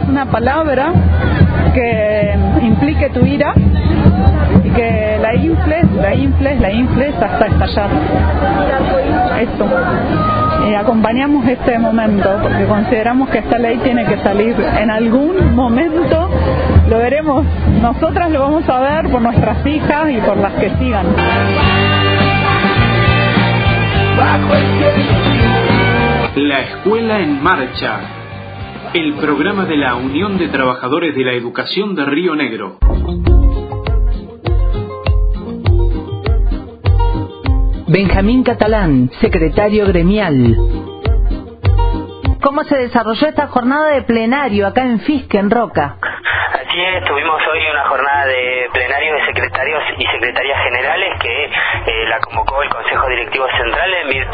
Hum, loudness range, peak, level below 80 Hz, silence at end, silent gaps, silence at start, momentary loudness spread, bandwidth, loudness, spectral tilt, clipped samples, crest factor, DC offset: none; 4 LU; 0 dBFS; -22 dBFS; 0 s; none; 0 s; 6 LU; 5 kHz; -13 LUFS; -10.5 dB/octave; under 0.1%; 12 dB; under 0.1%